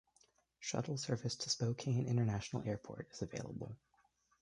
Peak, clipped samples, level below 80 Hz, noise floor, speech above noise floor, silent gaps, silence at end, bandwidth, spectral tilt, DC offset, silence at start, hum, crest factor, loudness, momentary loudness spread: -22 dBFS; under 0.1%; -66 dBFS; -76 dBFS; 36 dB; none; 0.65 s; 11 kHz; -5 dB/octave; under 0.1%; 0.6 s; none; 18 dB; -40 LUFS; 12 LU